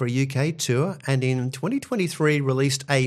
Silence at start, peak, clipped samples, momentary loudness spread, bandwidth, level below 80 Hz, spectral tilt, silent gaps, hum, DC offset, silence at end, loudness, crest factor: 0 s; -4 dBFS; under 0.1%; 4 LU; 14 kHz; -64 dBFS; -5.5 dB/octave; none; none; under 0.1%; 0 s; -24 LUFS; 18 dB